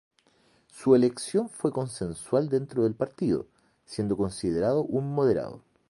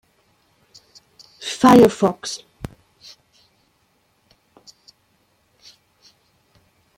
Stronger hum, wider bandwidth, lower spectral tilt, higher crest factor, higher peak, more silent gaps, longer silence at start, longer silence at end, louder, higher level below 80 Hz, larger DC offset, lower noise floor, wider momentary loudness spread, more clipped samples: neither; second, 11.5 kHz vs 16.5 kHz; first, -7 dB/octave vs -5.5 dB/octave; about the same, 20 dB vs 22 dB; second, -8 dBFS vs -2 dBFS; neither; second, 0.75 s vs 1.4 s; second, 0.3 s vs 4.6 s; second, -27 LUFS vs -16 LUFS; about the same, -58 dBFS vs -54 dBFS; neither; about the same, -65 dBFS vs -64 dBFS; second, 11 LU vs 26 LU; neither